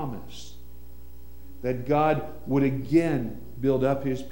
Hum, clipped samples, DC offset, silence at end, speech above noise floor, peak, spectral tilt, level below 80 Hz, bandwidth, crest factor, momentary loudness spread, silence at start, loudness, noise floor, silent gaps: none; under 0.1%; 1%; 0 s; 22 dB; -10 dBFS; -8 dB/octave; -48 dBFS; 16.5 kHz; 18 dB; 16 LU; 0 s; -26 LUFS; -47 dBFS; none